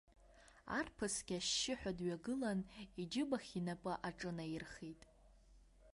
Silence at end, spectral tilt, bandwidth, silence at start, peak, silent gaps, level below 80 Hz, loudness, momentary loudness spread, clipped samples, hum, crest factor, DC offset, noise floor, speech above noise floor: 0.05 s; -3.5 dB/octave; 11.5 kHz; 0.1 s; -26 dBFS; none; -66 dBFS; -43 LUFS; 13 LU; under 0.1%; none; 18 dB; under 0.1%; -66 dBFS; 23 dB